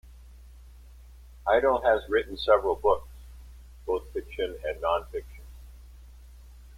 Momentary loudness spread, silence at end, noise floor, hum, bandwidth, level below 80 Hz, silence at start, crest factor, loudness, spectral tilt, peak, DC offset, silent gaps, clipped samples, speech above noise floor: 25 LU; 0 s; -49 dBFS; none; 16 kHz; -46 dBFS; 0.05 s; 22 dB; -27 LUFS; -5.5 dB/octave; -8 dBFS; under 0.1%; none; under 0.1%; 23 dB